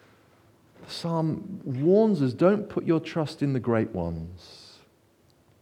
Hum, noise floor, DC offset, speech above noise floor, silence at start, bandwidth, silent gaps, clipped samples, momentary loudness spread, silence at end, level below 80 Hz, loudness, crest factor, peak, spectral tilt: none; -62 dBFS; under 0.1%; 37 dB; 0.8 s; 12 kHz; none; under 0.1%; 17 LU; 1 s; -60 dBFS; -26 LUFS; 20 dB; -8 dBFS; -8 dB/octave